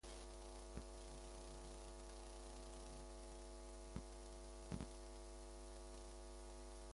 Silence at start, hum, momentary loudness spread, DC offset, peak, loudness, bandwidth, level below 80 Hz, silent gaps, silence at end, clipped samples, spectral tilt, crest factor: 0.05 s; none; 3 LU; under 0.1%; -34 dBFS; -56 LUFS; 11.5 kHz; -58 dBFS; none; 0 s; under 0.1%; -4.5 dB/octave; 20 dB